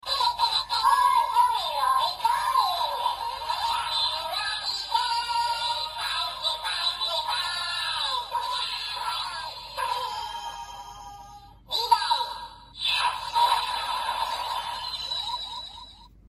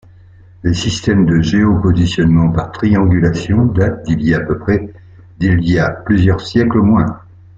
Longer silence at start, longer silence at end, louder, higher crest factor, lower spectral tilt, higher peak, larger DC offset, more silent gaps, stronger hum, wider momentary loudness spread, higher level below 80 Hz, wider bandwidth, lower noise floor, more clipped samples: second, 0.05 s vs 0.65 s; second, 0.2 s vs 0.4 s; second, -26 LUFS vs -14 LUFS; first, 20 dB vs 12 dB; second, 0.5 dB/octave vs -7 dB/octave; second, -8 dBFS vs 0 dBFS; neither; neither; neither; first, 12 LU vs 6 LU; second, -56 dBFS vs -34 dBFS; first, 15 kHz vs 7.8 kHz; first, -48 dBFS vs -41 dBFS; neither